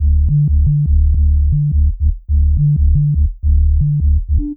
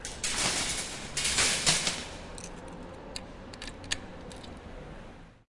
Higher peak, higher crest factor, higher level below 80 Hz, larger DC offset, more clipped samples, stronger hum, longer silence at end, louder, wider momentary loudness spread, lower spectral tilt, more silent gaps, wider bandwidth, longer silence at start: first, -4 dBFS vs -12 dBFS; second, 8 dB vs 22 dB; first, -14 dBFS vs -50 dBFS; neither; neither; neither; about the same, 0 s vs 0.1 s; first, -15 LUFS vs -28 LUFS; second, 3 LU vs 21 LU; first, -17.5 dB/octave vs -1 dB/octave; neither; second, 0.5 kHz vs 11.5 kHz; about the same, 0 s vs 0 s